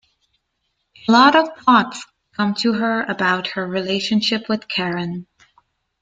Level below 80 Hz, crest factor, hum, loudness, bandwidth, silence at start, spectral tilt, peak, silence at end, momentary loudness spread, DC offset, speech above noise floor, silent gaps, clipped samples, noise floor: -62 dBFS; 20 dB; none; -18 LUFS; 9 kHz; 1.05 s; -5 dB/octave; 0 dBFS; 0.8 s; 15 LU; under 0.1%; 54 dB; none; under 0.1%; -72 dBFS